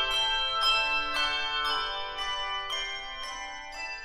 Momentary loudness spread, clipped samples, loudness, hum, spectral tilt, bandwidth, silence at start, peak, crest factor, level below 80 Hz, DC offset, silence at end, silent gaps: 13 LU; under 0.1%; -28 LUFS; none; 0 dB/octave; 15.5 kHz; 0 s; -14 dBFS; 18 dB; -50 dBFS; under 0.1%; 0 s; none